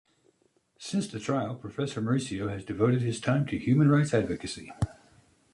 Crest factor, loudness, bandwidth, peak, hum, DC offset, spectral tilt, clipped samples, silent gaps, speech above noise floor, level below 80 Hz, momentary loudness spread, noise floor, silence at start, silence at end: 18 dB; -29 LUFS; 11.5 kHz; -12 dBFS; none; under 0.1%; -6.5 dB/octave; under 0.1%; none; 42 dB; -52 dBFS; 12 LU; -69 dBFS; 0.8 s; 0.6 s